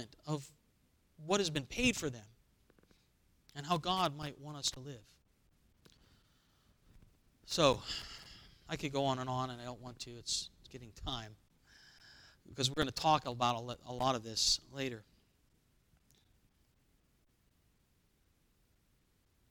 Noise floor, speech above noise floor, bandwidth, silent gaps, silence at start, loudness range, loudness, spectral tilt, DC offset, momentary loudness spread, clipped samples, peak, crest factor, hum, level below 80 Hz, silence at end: -74 dBFS; 37 dB; 19 kHz; none; 0 s; 8 LU; -36 LUFS; -3.5 dB/octave; under 0.1%; 21 LU; under 0.1%; -12 dBFS; 28 dB; none; -60 dBFS; 4.5 s